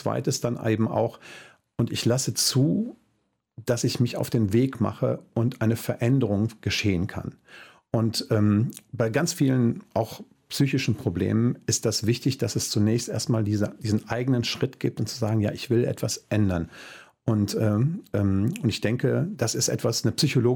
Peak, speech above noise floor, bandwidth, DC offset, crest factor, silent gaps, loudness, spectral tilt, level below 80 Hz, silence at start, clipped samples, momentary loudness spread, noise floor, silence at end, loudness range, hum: -10 dBFS; 48 dB; 17.5 kHz; under 0.1%; 16 dB; none; -25 LUFS; -5.5 dB/octave; -56 dBFS; 0 s; under 0.1%; 7 LU; -72 dBFS; 0 s; 1 LU; none